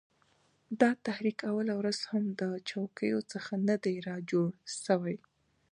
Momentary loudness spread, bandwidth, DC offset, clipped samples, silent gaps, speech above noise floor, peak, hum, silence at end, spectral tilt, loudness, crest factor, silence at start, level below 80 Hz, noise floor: 9 LU; 10.5 kHz; under 0.1%; under 0.1%; none; 38 dB; -12 dBFS; none; 0.55 s; -5.5 dB/octave; -33 LUFS; 22 dB; 0.7 s; -80 dBFS; -70 dBFS